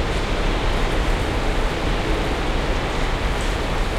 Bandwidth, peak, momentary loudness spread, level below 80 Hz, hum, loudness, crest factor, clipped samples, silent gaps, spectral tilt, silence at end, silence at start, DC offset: 13.5 kHz; -8 dBFS; 1 LU; -24 dBFS; none; -23 LUFS; 12 dB; under 0.1%; none; -5 dB/octave; 0 s; 0 s; under 0.1%